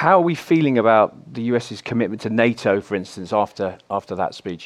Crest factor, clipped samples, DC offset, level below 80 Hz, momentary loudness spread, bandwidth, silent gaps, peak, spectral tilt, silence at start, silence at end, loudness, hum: 18 dB; under 0.1%; under 0.1%; -62 dBFS; 11 LU; 13 kHz; none; -2 dBFS; -6.5 dB/octave; 0 s; 0 s; -20 LUFS; none